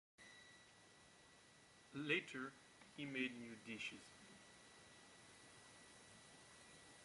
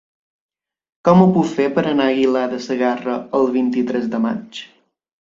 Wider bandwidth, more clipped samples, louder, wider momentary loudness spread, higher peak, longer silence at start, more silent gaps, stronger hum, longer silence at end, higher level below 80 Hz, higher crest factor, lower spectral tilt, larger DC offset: first, 11.5 kHz vs 7.6 kHz; neither; second, -48 LUFS vs -17 LUFS; first, 23 LU vs 10 LU; second, -28 dBFS vs 0 dBFS; second, 0.2 s vs 1.05 s; neither; neither; second, 0 s vs 0.55 s; second, -84 dBFS vs -58 dBFS; first, 26 dB vs 18 dB; second, -3.5 dB/octave vs -7.5 dB/octave; neither